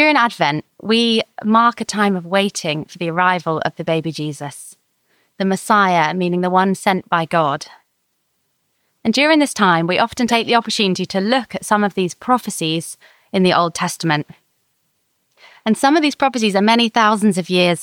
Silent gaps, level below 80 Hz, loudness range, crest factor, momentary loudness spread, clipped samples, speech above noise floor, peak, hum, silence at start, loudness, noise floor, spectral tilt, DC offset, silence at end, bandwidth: none; -62 dBFS; 4 LU; 16 dB; 10 LU; under 0.1%; 52 dB; -2 dBFS; none; 0 s; -17 LUFS; -68 dBFS; -4.5 dB/octave; under 0.1%; 0 s; 17 kHz